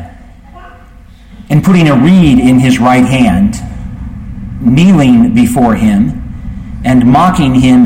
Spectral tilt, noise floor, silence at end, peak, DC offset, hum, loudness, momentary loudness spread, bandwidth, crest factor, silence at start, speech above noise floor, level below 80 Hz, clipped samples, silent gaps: -7 dB/octave; -34 dBFS; 0 s; 0 dBFS; under 0.1%; none; -8 LUFS; 18 LU; 16 kHz; 8 dB; 0 s; 28 dB; -26 dBFS; under 0.1%; none